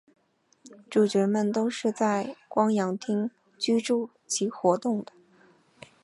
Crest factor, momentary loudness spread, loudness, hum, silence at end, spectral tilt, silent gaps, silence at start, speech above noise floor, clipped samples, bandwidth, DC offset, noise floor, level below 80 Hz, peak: 20 dB; 7 LU; -27 LUFS; none; 1 s; -5 dB/octave; none; 0.65 s; 37 dB; under 0.1%; 11.5 kHz; under 0.1%; -63 dBFS; -78 dBFS; -8 dBFS